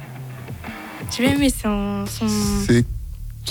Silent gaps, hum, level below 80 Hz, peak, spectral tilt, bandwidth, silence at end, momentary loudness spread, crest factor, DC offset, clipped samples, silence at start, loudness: none; none; -34 dBFS; -6 dBFS; -5 dB/octave; over 20 kHz; 0 s; 16 LU; 16 dB; under 0.1%; under 0.1%; 0 s; -21 LUFS